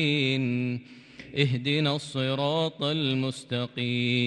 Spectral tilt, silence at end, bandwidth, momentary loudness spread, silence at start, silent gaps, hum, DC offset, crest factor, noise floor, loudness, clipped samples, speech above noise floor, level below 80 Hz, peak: -6 dB/octave; 0 s; 11 kHz; 8 LU; 0 s; none; none; under 0.1%; 18 dB; -47 dBFS; -27 LUFS; under 0.1%; 21 dB; -68 dBFS; -10 dBFS